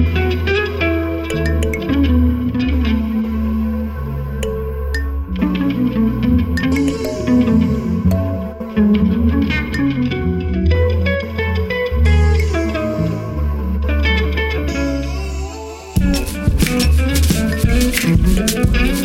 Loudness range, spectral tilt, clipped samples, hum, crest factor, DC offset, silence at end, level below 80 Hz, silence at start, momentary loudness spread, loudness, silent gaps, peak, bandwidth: 3 LU; -6 dB/octave; under 0.1%; none; 14 dB; under 0.1%; 0 s; -20 dBFS; 0 s; 8 LU; -17 LUFS; none; -2 dBFS; 16.5 kHz